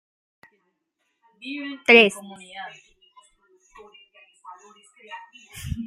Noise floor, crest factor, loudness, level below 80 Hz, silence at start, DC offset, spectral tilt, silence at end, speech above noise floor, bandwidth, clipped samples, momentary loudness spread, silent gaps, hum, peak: -76 dBFS; 24 dB; -17 LUFS; -50 dBFS; 1.45 s; under 0.1%; -4 dB/octave; 0 s; 54 dB; 15.5 kHz; under 0.1%; 27 LU; none; none; -2 dBFS